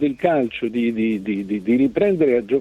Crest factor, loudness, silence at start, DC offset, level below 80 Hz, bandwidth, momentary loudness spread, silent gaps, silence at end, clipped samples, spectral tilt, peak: 16 dB; -20 LUFS; 0 s; under 0.1%; -54 dBFS; 7.4 kHz; 6 LU; none; 0 s; under 0.1%; -8 dB/octave; -4 dBFS